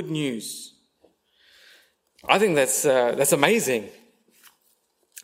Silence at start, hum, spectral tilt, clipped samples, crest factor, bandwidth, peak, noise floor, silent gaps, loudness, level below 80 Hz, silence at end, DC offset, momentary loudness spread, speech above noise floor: 0 s; none; -3 dB/octave; under 0.1%; 26 dB; 16 kHz; 0 dBFS; -67 dBFS; none; -21 LUFS; -70 dBFS; 0.05 s; under 0.1%; 19 LU; 45 dB